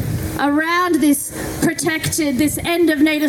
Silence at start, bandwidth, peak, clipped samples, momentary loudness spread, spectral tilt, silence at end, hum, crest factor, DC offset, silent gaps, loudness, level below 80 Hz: 0 s; 17.5 kHz; -4 dBFS; under 0.1%; 5 LU; -4 dB/octave; 0 s; none; 12 dB; under 0.1%; none; -17 LUFS; -40 dBFS